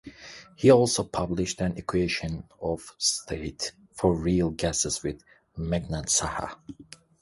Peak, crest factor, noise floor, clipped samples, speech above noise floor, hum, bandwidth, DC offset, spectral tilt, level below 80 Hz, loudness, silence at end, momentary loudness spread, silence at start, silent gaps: -6 dBFS; 20 dB; -46 dBFS; under 0.1%; 19 dB; none; 11.5 kHz; under 0.1%; -4 dB/octave; -46 dBFS; -26 LUFS; 0.4 s; 22 LU; 0.05 s; none